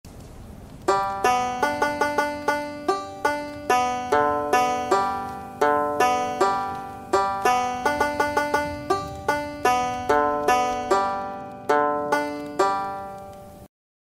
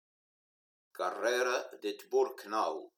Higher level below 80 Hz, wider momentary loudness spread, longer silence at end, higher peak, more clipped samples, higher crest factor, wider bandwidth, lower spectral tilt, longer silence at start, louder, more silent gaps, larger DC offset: first, -50 dBFS vs under -90 dBFS; about the same, 11 LU vs 9 LU; first, 0.4 s vs 0.1 s; first, -6 dBFS vs -18 dBFS; neither; about the same, 18 dB vs 18 dB; second, 16 kHz vs 18 kHz; first, -3.5 dB/octave vs -1.5 dB/octave; second, 0.05 s vs 0.95 s; first, -23 LUFS vs -34 LUFS; neither; neither